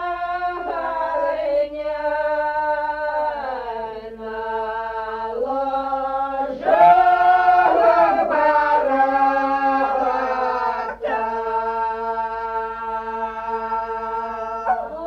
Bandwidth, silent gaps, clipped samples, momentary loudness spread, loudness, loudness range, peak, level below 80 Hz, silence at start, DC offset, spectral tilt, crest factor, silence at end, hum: 6.6 kHz; none; under 0.1%; 12 LU; -20 LUFS; 9 LU; -4 dBFS; -50 dBFS; 0 s; under 0.1%; -5.5 dB/octave; 16 dB; 0 s; 50 Hz at -50 dBFS